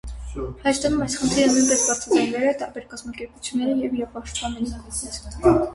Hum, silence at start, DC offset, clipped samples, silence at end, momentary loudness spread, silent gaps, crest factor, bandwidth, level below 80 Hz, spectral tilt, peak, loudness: none; 0.05 s; under 0.1%; under 0.1%; 0 s; 15 LU; none; 20 dB; 11.5 kHz; -40 dBFS; -3.5 dB/octave; -4 dBFS; -22 LUFS